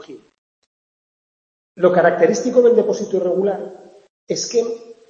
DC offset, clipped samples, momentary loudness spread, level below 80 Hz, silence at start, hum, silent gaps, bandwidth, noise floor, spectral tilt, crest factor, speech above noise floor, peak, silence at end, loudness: under 0.1%; under 0.1%; 13 LU; -70 dBFS; 0.1 s; none; 0.38-1.75 s, 4.10-4.27 s; 7.4 kHz; under -90 dBFS; -4.5 dB/octave; 18 dB; over 73 dB; 0 dBFS; 0.15 s; -17 LUFS